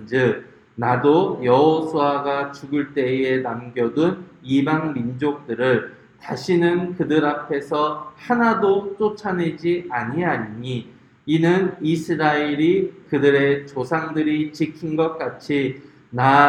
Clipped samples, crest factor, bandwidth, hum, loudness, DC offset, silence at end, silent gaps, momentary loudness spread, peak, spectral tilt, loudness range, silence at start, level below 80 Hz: under 0.1%; 20 dB; 10.5 kHz; none; -21 LUFS; under 0.1%; 0 s; none; 10 LU; 0 dBFS; -7 dB/octave; 3 LU; 0 s; -62 dBFS